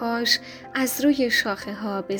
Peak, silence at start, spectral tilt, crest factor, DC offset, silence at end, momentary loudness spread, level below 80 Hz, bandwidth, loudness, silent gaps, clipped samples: -4 dBFS; 0 s; -2.5 dB/octave; 20 dB; under 0.1%; 0 s; 9 LU; -60 dBFS; over 20 kHz; -23 LUFS; none; under 0.1%